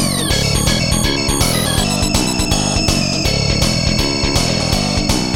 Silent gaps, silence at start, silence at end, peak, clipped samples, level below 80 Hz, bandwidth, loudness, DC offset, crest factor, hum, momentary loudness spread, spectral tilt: none; 0 s; 0 s; 0 dBFS; under 0.1%; -24 dBFS; 17 kHz; -15 LUFS; 0.9%; 16 dB; none; 1 LU; -3.5 dB/octave